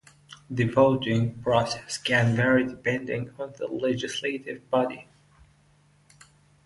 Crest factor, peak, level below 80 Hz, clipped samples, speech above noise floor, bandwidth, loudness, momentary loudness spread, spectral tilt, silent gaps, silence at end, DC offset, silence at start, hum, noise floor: 20 dB; -6 dBFS; -58 dBFS; under 0.1%; 36 dB; 11.5 kHz; -26 LUFS; 12 LU; -5.5 dB/octave; none; 1.65 s; under 0.1%; 0.3 s; none; -61 dBFS